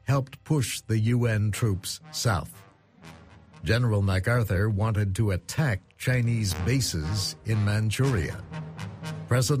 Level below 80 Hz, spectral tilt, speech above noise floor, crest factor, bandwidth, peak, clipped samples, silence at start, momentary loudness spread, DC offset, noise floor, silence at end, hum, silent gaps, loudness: -46 dBFS; -5.5 dB/octave; 25 dB; 16 dB; 15.5 kHz; -10 dBFS; under 0.1%; 0.05 s; 11 LU; under 0.1%; -50 dBFS; 0 s; none; none; -27 LUFS